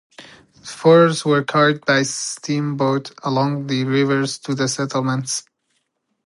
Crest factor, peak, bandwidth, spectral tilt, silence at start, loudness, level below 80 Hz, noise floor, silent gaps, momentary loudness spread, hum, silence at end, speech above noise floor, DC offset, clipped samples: 18 dB; -2 dBFS; 11.5 kHz; -5 dB/octave; 0.2 s; -18 LUFS; -66 dBFS; -70 dBFS; none; 10 LU; none; 0.85 s; 52 dB; under 0.1%; under 0.1%